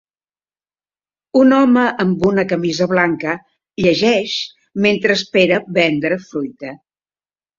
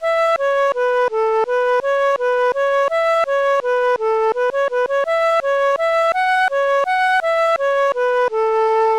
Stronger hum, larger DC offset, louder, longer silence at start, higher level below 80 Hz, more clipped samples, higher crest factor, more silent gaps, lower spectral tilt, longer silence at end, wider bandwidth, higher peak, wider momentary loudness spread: first, 50 Hz at -45 dBFS vs none; neither; about the same, -15 LUFS vs -17 LUFS; first, 1.35 s vs 0 s; about the same, -54 dBFS vs -56 dBFS; neither; first, 16 dB vs 8 dB; neither; first, -5.5 dB/octave vs -1 dB/octave; first, 0.8 s vs 0 s; second, 7.4 kHz vs 12 kHz; first, -2 dBFS vs -10 dBFS; first, 14 LU vs 2 LU